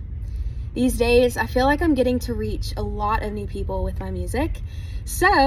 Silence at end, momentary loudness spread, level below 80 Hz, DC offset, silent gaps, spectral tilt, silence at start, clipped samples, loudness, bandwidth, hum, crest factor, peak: 0 s; 13 LU; -30 dBFS; under 0.1%; none; -5.5 dB/octave; 0 s; under 0.1%; -23 LUFS; 15.5 kHz; none; 16 dB; -6 dBFS